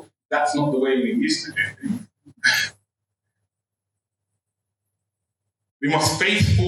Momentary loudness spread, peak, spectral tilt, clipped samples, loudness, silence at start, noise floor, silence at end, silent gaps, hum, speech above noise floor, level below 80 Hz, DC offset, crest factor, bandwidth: 10 LU; -4 dBFS; -4.5 dB/octave; under 0.1%; -21 LUFS; 0.3 s; -85 dBFS; 0 s; 5.71-5.80 s; none; 64 dB; -48 dBFS; under 0.1%; 20 dB; 14 kHz